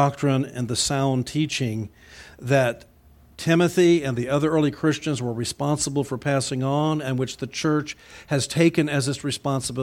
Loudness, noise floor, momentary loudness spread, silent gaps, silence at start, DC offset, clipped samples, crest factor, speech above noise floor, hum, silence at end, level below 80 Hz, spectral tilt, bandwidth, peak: -23 LUFS; -53 dBFS; 8 LU; none; 0 s; under 0.1%; under 0.1%; 18 dB; 30 dB; none; 0 s; -54 dBFS; -5 dB/octave; 16 kHz; -6 dBFS